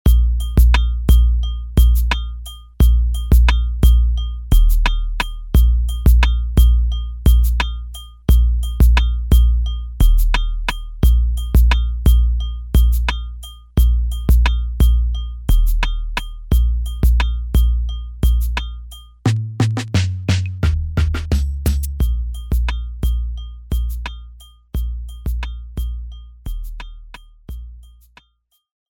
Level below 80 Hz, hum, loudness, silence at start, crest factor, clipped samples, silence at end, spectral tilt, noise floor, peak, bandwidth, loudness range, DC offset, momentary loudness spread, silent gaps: -16 dBFS; none; -18 LUFS; 0.05 s; 14 dB; under 0.1%; 1.1 s; -6 dB/octave; -64 dBFS; -2 dBFS; 18 kHz; 11 LU; under 0.1%; 15 LU; none